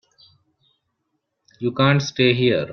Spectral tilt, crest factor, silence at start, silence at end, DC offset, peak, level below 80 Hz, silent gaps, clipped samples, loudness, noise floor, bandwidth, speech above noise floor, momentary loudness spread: -6 dB/octave; 20 dB; 1.6 s; 0 s; under 0.1%; -2 dBFS; -58 dBFS; none; under 0.1%; -19 LUFS; -75 dBFS; 6.6 kHz; 57 dB; 10 LU